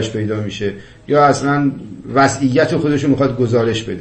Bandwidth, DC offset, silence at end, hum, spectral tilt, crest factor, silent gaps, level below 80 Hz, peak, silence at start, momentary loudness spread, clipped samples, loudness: 8.8 kHz; under 0.1%; 0 s; none; -6 dB/octave; 16 dB; none; -46 dBFS; 0 dBFS; 0 s; 10 LU; under 0.1%; -16 LUFS